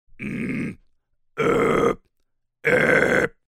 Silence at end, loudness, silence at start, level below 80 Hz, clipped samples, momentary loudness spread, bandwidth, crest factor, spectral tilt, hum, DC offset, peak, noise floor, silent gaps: 0.2 s; -21 LUFS; 0.2 s; -48 dBFS; under 0.1%; 15 LU; 15 kHz; 20 dB; -6 dB/octave; none; under 0.1%; -2 dBFS; -71 dBFS; none